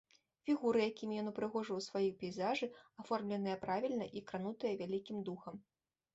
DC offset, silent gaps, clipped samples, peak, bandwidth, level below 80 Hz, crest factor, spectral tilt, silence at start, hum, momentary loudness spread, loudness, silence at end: under 0.1%; none; under 0.1%; -24 dBFS; 8 kHz; -80 dBFS; 16 dB; -4.5 dB/octave; 0.45 s; none; 10 LU; -40 LUFS; 0.55 s